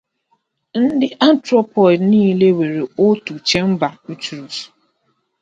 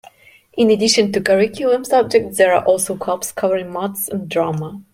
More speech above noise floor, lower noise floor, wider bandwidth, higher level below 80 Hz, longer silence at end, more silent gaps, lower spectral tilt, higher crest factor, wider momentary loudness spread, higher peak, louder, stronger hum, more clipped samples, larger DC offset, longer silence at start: first, 51 dB vs 31 dB; first, -66 dBFS vs -48 dBFS; second, 9 kHz vs 16.5 kHz; about the same, -56 dBFS vs -58 dBFS; first, 0.75 s vs 0.1 s; neither; first, -6 dB/octave vs -4 dB/octave; about the same, 16 dB vs 16 dB; first, 15 LU vs 9 LU; about the same, 0 dBFS vs -2 dBFS; about the same, -15 LUFS vs -17 LUFS; neither; neither; neither; first, 0.75 s vs 0.55 s